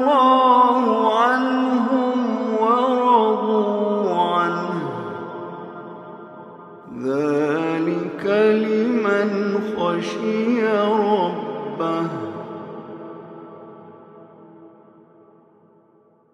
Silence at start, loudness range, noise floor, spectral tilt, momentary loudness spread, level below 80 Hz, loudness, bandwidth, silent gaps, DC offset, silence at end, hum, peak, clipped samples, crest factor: 0 s; 12 LU; -56 dBFS; -6.5 dB/octave; 21 LU; -74 dBFS; -19 LUFS; 10 kHz; none; under 0.1%; 1.65 s; none; -2 dBFS; under 0.1%; 18 dB